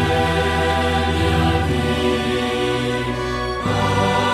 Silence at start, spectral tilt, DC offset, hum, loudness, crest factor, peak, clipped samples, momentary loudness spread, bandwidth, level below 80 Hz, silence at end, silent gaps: 0 s; -5.5 dB/octave; under 0.1%; none; -19 LUFS; 12 dB; -6 dBFS; under 0.1%; 5 LU; 14.5 kHz; -34 dBFS; 0 s; none